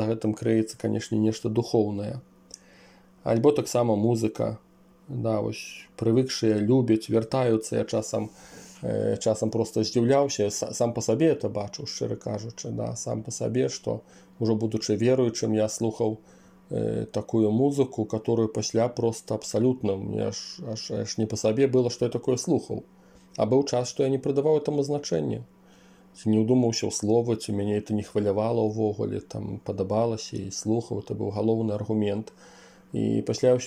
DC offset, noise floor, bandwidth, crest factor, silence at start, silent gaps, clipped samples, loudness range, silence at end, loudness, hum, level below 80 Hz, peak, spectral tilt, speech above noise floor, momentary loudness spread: under 0.1%; -54 dBFS; 15.5 kHz; 18 dB; 0 s; none; under 0.1%; 3 LU; 0 s; -26 LUFS; none; -62 dBFS; -8 dBFS; -6 dB/octave; 29 dB; 11 LU